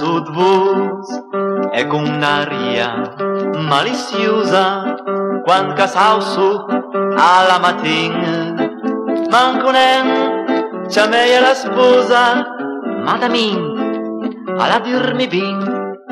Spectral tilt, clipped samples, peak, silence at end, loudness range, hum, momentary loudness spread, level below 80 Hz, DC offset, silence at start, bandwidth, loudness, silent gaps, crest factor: -4.5 dB/octave; under 0.1%; 0 dBFS; 0 s; 4 LU; none; 10 LU; -64 dBFS; under 0.1%; 0 s; 12.5 kHz; -15 LUFS; none; 14 dB